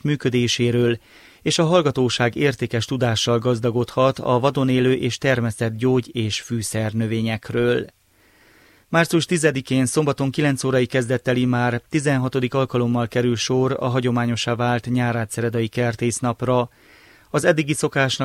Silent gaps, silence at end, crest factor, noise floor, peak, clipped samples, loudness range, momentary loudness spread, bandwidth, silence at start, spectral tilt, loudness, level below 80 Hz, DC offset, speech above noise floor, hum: none; 0 s; 16 dB; -56 dBFS; -4 dBFS; under 0.1%; 3 LU; 5 LU; 15 kHz; 0.05 s; -5.5 dB/octave; -21 LUFS; -54 dBFS; under 0.1%; 36 dB; none